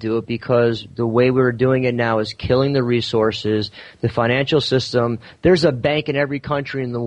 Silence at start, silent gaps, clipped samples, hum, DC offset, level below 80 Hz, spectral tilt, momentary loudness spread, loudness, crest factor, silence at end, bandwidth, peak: 0 s; none; under 0.1%; none; under 0.1%; -46 dBFS; -6.5 dB/octave; 7 LU; -19 LUFS; 14 dB; 0 s; 10 kHz; -4 dBFS